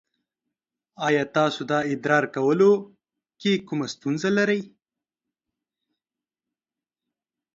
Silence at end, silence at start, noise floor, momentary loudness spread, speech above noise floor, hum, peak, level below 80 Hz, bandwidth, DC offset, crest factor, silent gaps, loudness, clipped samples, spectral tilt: 2.9 s; 1 s; under -90 dBFS; 9 LU; over 68 dB; none; -4 dBFS; -70 dBFS; 7.8 kHz; under 0.1%; 22 dB; none; -23 LUFS; under 0.1%; -5.5 dB/octave